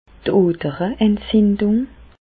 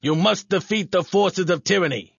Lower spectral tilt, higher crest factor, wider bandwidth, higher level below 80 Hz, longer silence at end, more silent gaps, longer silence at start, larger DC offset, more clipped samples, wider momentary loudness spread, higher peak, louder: first, -12 dB/octave vs -4.5 dB/octave; about the same, 14 dB vs 16 dB; second, 4.7 kHz vs 7.4 kHz; first, -42 dBFS vs -62 dBFS; about the same, 0.2 s vs 0.15 s; neither; first, 0.25 s vs 0 s; neither; neither; first, 6 LU vs 3 LU; about the same, -4 dBFS vs -6 dBFS; first, -18 LUFS vs -21 LUFS